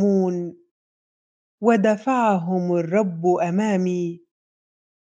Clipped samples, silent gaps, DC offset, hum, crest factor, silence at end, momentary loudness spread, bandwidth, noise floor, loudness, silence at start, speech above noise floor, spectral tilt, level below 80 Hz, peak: under 0.1%; 0.71-1.58 s; under 0.1%; none; 18 dB; 0.95 s; 10 LU; 7.8 kHz; under -90 dBFS; -21 LUFS; 0 s; over 70 dB; -7.5 dB/octave; -72 dBFS; -4 dBFS